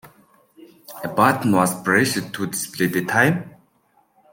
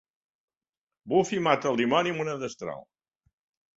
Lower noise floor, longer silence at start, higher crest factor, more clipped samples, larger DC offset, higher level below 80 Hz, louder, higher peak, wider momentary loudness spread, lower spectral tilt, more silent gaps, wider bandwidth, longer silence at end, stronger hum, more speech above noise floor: second, -62 dBFS vs under -90 dBFS; second, 0.05 s vs 1.05 s; about the same, 20 dB vs 24 dB; neither; neither; first, -62 dBFS vs -70 dBFS; first, -20 LUFS vs -26 LUFS; first, -2 dBFS vs -6 dBFS; second, 9 LU vs 14 LU; about the same, -4.5 dB/octave vs -5 dB/octave; neither; first, 17 kHz vs 8 kHz; about the same, 0.85 s vs 0.95 s; neither; second, 42 dB vs over 64 dB